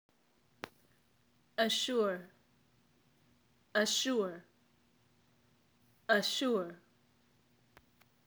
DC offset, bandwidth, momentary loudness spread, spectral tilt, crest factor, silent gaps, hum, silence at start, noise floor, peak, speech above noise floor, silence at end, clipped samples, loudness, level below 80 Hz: under 0.1%; over 20 kHz; 20 LU; -2.5 dB/octave; 24 dB; none; none; 0.65 s; -72 dBFS; -14 dBFS; 39 dB; 1.5 s; under 0.1%; -33 LUFS; -84 dBFS